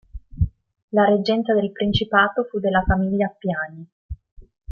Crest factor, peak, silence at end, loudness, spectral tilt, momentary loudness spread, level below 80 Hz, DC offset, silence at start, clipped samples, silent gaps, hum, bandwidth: 18 dB; -4 dBFS; 0 s; -21 LUFS; -8 dB/octave; 16 LU; -36 dBFS; under 0.1%; 0.15 s; under 0.1%; 0.82-0.88 s, 3.92-4.09 s, 4.32-4.36 s; none; 6.6 kHz